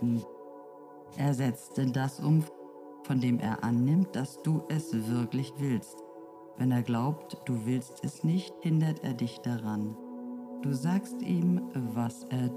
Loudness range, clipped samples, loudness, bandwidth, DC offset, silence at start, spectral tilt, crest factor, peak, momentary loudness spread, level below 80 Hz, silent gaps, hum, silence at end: 3 LU; under 0.1%; -31 LUFS; 15.5 kHz; under 0.1%; 0 s; -7.5 dB/octave; 14 dB; -16 dBFS; 18 LU; -74 dBFS; none; none; 0 s